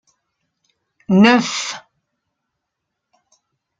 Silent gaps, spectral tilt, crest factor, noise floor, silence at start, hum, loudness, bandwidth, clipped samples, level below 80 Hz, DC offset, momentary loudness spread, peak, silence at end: none; -5 dB/octave; 20 dB; -78 dBFS; 1.1 s; none; -15 LUFS; 9.2 kHz; under 0.1%; -62 dBFS; under 0.1%; 16 LU; -2 dBFS; 2 s